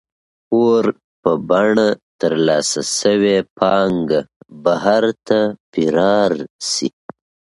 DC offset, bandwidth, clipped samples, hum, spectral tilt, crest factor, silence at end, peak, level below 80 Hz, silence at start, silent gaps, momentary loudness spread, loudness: under 0.1%; 11.5 kHz; under 0.1%; none; -4.5 dB/octave; 16 dB; 0.7 s; 0 dBFS; -56 dBFS; 0.5 s; 1.04-1.23 s, 2.03-2.19 s, 3.50-3.56 s, 4.36-4.40 s, 5.60-5.73 s, 6.50-6.59 s; 7 LU; -17 LUFS